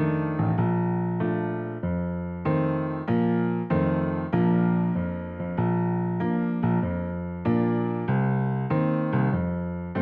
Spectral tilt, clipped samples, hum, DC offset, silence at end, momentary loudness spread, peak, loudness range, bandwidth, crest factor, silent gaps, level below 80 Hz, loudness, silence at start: -12 dB/octave; under 0.1%; none; under 0.1%; 0 s; 6 LU; -10 dBFS; 1 LU; 4.3 kHz; 14 dB; none; -50 dBFS; -26 LUFS; 0 s